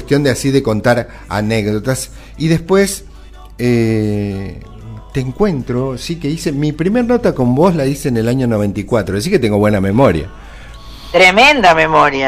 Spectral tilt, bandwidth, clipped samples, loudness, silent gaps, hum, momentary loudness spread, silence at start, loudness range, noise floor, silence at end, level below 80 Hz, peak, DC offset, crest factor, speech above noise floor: -5.5 dB/octave; 15.5 kHz; under 0.1%; -13 LUFS; none; none; 13 LU; 0 s; 6 LU; -35 dBFS; 0 s; -34 dBFS; 0 dBFS; under 0.1%; 14 dB; 22 dB